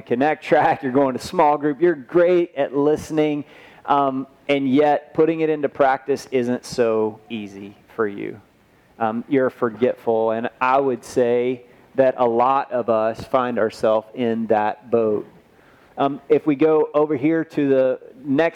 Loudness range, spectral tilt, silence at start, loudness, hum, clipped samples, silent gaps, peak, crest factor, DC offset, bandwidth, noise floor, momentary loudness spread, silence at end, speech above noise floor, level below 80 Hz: 4 LU; -6.5 dB/octave; 0.1 s; -20 LUFS; none; under 0.1%; none; -4 dBFS; 16 dB; under 0.1%; 13 kHz; -55 dBFS; 9 LU; 0 s; 36 dB; -60 dBFS